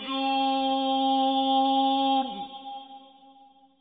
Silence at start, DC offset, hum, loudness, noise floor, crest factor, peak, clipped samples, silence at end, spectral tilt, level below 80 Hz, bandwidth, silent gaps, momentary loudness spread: 0 s; under 0.1%; none; -25 LUFS; -56 dBFS; 12 dB; -14 dBFS; under 0.1%; 0.8 s; -6 dB/octave; -70 dBFS; 4.9 kHz; none; 16 LU